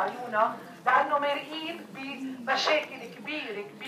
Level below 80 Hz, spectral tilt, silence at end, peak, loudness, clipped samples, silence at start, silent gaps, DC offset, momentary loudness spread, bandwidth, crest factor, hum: -88 dBFS; -3 dB/octave; 0 s; -10 dBFS; -29 LUFS; under 0.1%; 0 s; none; under 0.1%; 13 LU; 15.5 kHz; 18 dB; none